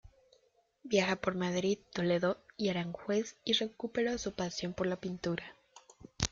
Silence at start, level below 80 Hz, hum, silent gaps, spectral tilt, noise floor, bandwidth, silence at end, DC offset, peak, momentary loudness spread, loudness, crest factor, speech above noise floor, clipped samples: 0.05 s; -60 dBFS; none; none; -4.5 dB/octave; -71 dBFS; 7.8 kHz; 0.05 s; under 0.1%; -10 dBFS; 6 LU; -34 LUFS; 26 dB; 38 dB; under 0.1%